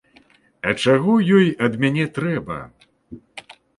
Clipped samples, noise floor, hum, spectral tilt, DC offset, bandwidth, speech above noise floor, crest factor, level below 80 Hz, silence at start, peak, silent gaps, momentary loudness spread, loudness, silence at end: under 0.1%; -55 dBFS; none; -6.5 dB/octave; under 0.1%; 11.5 kHz; 37 dB; 18 dB; -54 dBFS; 0.65 s; -2 dBFS; none; 23 LU; -19 LUFS; 0.4 s